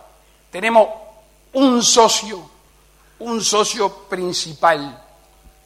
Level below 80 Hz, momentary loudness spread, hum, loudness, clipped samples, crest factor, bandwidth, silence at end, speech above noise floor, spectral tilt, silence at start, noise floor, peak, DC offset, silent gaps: -54 dBFS; 21 LU; none; -17 LUFS; under 0.1%; 18 dB; 16 kHz; 0.7 s; 35 dB; -2 dB/octave; 0.55 s; -52 dBFS; -2 dBFS; under 0.1%; none